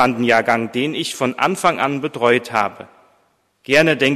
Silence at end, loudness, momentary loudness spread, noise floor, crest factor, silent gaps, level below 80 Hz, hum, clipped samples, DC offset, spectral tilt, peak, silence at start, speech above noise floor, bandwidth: 0 s; -17 LUFS; 7 LU; -61 dBFS; 18 dB; none; -60 dBFS; none; under 0.1%; under 0.1%; -4.5 dB/octave; 0 dBFS; 0 s; 44 dB; 14 kHz